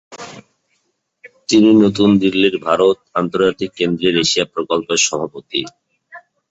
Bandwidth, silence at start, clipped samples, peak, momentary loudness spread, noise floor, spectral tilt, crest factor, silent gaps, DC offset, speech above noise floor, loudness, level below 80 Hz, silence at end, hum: 8.2 kHz; 0.1 s; under 0.1%; 0 dBFS; 14 LU; -67 dBFS; -4 dB/octave; 16 dB; none; under 0.1%; 52 dB; -15 LUFS; -54 dBFS; 0.3 s; none